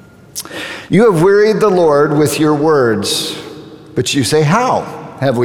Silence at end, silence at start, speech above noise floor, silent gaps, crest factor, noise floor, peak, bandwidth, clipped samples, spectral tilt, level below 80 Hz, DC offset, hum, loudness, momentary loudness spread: 0 s; 0.35 s; 21 dB; none; 12 dB; -32 dBFS; 0 dBFS; 18.5 kHz; under 0.1%; -5 dB/octave; -50 dBFS; under 0.1%; none; -12 LUFS; 15 LU